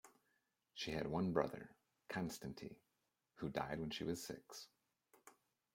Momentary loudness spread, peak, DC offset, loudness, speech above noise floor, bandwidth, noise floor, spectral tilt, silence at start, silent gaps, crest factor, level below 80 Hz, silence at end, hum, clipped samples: 17 LU; -20 dBFS; under 0.1%; -45 LUFS; 43 dB; 16.5 kHz; -87 dBFS; -5 dB/octave; 0.05 s; none; 26 dB; -70 dBFS; 0.4 s; none; under 0.1%